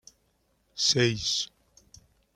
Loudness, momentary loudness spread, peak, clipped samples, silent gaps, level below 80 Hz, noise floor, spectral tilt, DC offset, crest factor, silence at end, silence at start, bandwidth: -26 LUFS; 15 LU; -10 dBFS; under 0.1%; none; -60 dBFS; -71 dBFS; -3 dB/octave; under 0.1%; 20 dB; 0.9 s; 0.75 s; 14.5 kHz